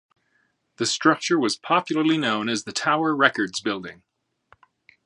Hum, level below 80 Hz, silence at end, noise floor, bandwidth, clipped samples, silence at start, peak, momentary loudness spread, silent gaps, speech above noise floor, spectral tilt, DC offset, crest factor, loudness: none; -70 dBFS; 1.15 s; -69 dBFS; 11.5 kHz; under 0.1%; 0.8 s; -2 dBFS; 8 LU; none; 46 dB; -3.5 dB/octave; under 0.1%; 22 dB; -22 LUFS